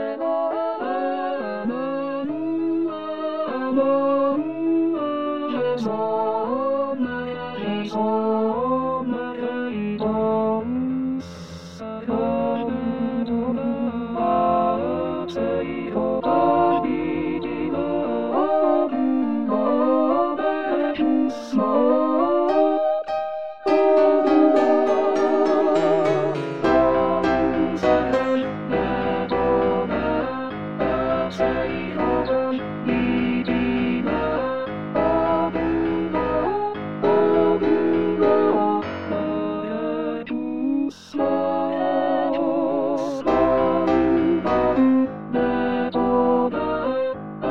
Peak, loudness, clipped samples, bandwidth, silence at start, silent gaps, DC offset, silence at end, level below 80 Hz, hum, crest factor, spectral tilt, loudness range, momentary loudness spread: -6 dBFS; -22 LUFS; under 0.1%; 7.8 kHz; 0 s; none; 0.5%; 0 s; -48 dBFS; none; 16 dB; -7.5 dB/octave; 5 LU; 8 LU